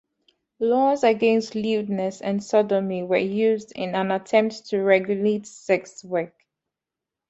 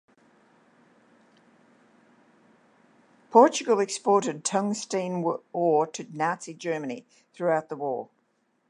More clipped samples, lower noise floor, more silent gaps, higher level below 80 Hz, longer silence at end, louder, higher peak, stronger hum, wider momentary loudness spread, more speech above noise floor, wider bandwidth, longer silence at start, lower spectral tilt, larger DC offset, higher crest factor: neither; first, -87 dBFS vs -71 dBFS; neither; first, -68 dBFS vs -84 dBFS; first, 1 s vs 0.65 s; first, -23 LUFS vs -26 LUFS; about the same, -6 dBFS vs -4 dBFS; neither; second, 9 LU vs 13 LU; first, 65 dB vs 46 dB; second, 8.2 kHz vs 11 kHz; second, 0.6 s vs 3.3 s; first, -6 dB/octave vs -4.5 dB/octave; neither; second, 18 dB vs 24 dB